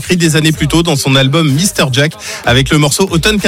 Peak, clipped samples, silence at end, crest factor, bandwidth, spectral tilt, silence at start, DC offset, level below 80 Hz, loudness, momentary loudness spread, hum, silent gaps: 0 dBFS; under 0.1%; 0 s; 10 dB; 16.5 kHz; -4.5 dB/octave; 0 s; under 0.1%; -30 dBFS; -10 LUFS; 3 LU; none; none